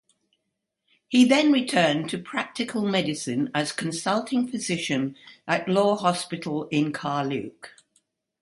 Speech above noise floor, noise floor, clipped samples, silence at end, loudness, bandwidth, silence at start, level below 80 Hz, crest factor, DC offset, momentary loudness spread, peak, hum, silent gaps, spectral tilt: 56 dB; -80 dBFS; under 0.1%; 0.7 s; -24 LUFS; 11.5 kHz; 1.1 s; -70 dBFS; 20 dB; under 0.1%; 10 LU; -6 dBFS; none; none; -4.5 dB/octave